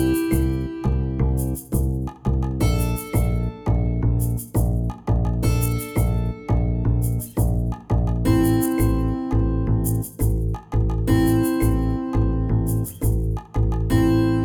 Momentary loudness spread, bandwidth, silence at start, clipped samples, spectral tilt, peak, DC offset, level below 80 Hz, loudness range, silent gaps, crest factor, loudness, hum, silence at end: 5 LU; over 20 kHz; 0 s; under 0.1%; -7 dB/octave; -8 dBFS; under 0.1%; -26 dBFS; 2 LU; none; 14 dB; -22 LUFS; none; 0 s